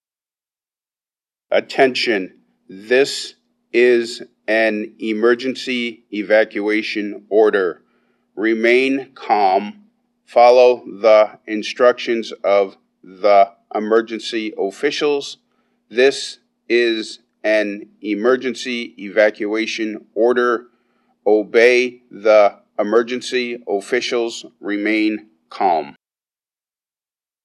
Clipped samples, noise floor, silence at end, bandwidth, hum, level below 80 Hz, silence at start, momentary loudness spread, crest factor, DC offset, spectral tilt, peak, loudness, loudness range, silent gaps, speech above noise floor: under 0.1%; under -90 dBFS; 1.5 s; 12 kHz; none; -80 dBFS; 1.5 s; 12 LU; 18 dB; under 0.1%; -4 dB/octave; 0 dBFS; -17 LUFS; 5 LU; none; over 73 dB